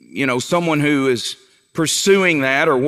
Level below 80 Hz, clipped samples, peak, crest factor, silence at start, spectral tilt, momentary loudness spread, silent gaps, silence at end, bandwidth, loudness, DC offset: -66 dBFS; under 0.1%; -2 dBFS; 14 dB; 0.15 s; -4 dB/octave; 11 LU; none; 0 s; 15.5 kHz; -16 LUFS; under 0.1%